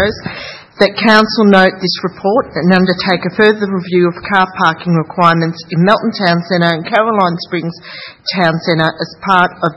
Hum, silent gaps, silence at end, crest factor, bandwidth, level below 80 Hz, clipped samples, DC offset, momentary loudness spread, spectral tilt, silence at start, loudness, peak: none; none; 0 s; 12 dB; 10 kHz; -48 dBFS; 0.3%; under 0.1%; 11 LU; -6.5 dB/octave; 0 s; -12 LUFS; 0 dBFS